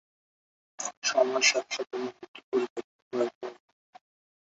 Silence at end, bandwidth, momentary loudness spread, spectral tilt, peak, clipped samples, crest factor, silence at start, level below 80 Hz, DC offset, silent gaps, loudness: 0.95 s; 8 kHz; 19 LU; -0.5 dB/octave; -10 dBFS; under 0.1%; 22 dB; 0.8 s; -82 dBFS; under 0.1%; 0.97-1.02 s, 2.28-2.34 s, 2.44-2.52 s, 2.70-2.76 s, 2.84-3.11 s, 3.35-3.41 s; -29 LUFS